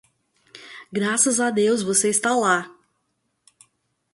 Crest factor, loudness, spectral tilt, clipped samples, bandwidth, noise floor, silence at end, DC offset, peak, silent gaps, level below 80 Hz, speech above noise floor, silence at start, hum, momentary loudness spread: 20 dB; -20 LUFS; -2.5 dB/octave; under 0.1%; 11.5 kHz; -73 dBFS; 1.45 s; under 0.1%; -4 dBFS; none; -68 dBFS; 53 dB; 0.55 s; none; 20 LU